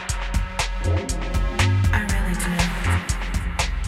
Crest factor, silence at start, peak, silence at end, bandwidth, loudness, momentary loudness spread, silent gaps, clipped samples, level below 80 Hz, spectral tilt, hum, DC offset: 16 dB; 0 s; -6 dBFS; 0 s; 15 kHz; -23 LUFS; 6 LU; none; under 0.1%; -26 dBFS; -4.5 dB/octave; none; under 0.1%